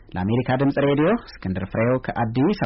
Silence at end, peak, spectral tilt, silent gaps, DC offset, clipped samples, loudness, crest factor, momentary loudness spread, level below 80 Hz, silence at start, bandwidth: 0 s; -12 dBFS; -6.5 dB/octave; none; under 0.1%; under 0.1%; -22 LUFS; 10 dB; 7 LU; -46 dBFS; 0.1 s; 5.8 kHz